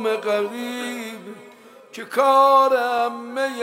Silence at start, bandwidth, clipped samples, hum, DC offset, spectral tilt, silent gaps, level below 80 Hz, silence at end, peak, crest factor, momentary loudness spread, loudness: 0 s; 16 kHz; under 0.1%; none; under 0.1%; -3 dB/octave; none; -80 dBFS; 0 s; -4 dBFS; 16 dB; 23 LU; -19 LUFS